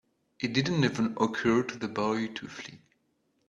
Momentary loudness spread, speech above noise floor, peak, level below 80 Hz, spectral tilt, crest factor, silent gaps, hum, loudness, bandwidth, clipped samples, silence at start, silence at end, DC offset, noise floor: 14 LU; 45 dB; -10 dBFS; -64 dBFS; -5.5 dB/octave; 20 dB; none; none; -29 LUFS; 8 kHz; under 0.1%; 0.4 s; 0.7 s; under 0.1%; -74 dBFS